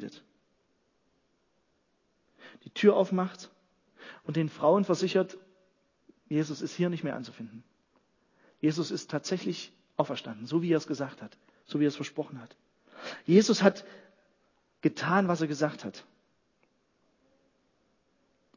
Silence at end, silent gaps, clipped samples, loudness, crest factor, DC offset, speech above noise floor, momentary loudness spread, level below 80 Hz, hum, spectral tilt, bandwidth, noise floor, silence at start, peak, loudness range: 2.55 s; none; under 0.1%; -29 LUFS; 26 dB; under 0.1%; 45 dB; 20 LU; -80 dBFS; none; -6 dB/octave; 7.4 kHz; -74 dBFS; 0 s; -6 dBFS; 6 LU